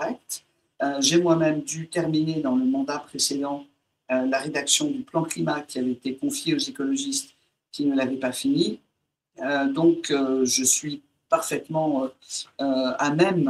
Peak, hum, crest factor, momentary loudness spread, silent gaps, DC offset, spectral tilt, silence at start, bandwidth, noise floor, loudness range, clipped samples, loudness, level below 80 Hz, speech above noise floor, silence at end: -4 dBFS; none; 20 dB; 11 LU; none; under 0.1%; -3.5 dB/octave; 0 s; 16 kHz; -77 dBFS; 3 LU; under 0.1%; -24 LUFS; -70 dBFS; 53 dB; 0 s